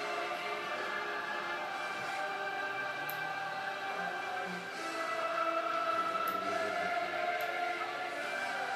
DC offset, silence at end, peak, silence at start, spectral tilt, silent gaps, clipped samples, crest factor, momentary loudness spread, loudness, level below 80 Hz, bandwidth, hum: under 0.1%; 0 s; -20 dBFS; 0 s; -2.5 dB/octave; none; under 0.1%; 16 dB; 5 LU; -36 LUFS; -84 dBFS; 15.5 kHz; none